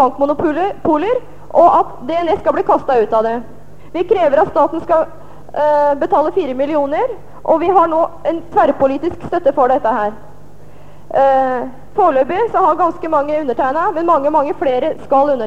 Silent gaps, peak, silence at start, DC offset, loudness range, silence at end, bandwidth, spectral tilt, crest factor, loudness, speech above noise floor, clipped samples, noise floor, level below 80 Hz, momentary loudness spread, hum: none; 0 dBFS; 0 s; 3%; 1 LU; 0 s; 8.6 kHz; -7 dB/octave; 14 dB; -15 LUFS; 26 dB; under 0.1%; -41 dBFS; -46 dBFS; 8 LU; 50 Hz at -45 dBFS